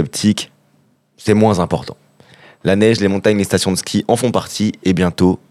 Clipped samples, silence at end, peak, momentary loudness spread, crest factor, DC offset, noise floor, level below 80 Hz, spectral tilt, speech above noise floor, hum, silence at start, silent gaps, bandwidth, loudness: under 0.1%; 0.15 s; 0 dBFS; 10 LU; 16 dB; under 0.1%; -57 dBFS; -48 dBFS; -5.5 dB/octave; 42 dB; none; 0 s; none; 14.5 kHz; -16 LUFS